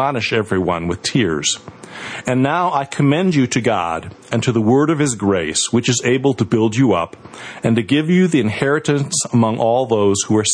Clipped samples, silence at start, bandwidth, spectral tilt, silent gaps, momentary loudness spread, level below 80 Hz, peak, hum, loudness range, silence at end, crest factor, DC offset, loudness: under 0.1%; 0 s; 10.5 kHz; -5 dB/octave; none; 9 LU; -50 dBFS; -2 dBFS; none; 2 LU; 0 s; 14 dB; under 0.1%; -17 LUFS